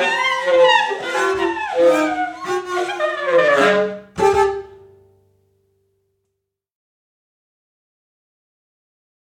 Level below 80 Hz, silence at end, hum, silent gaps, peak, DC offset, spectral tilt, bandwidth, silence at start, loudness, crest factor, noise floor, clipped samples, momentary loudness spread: -54 dBFS; 4.6 s; none; none; -2 dBFS; under 0.1%; -3.5 dB/octave; 13.5 kHz; 0 s; -17 LUFS; 18 dB; -77 dBFS; under 0.1%; 9 LU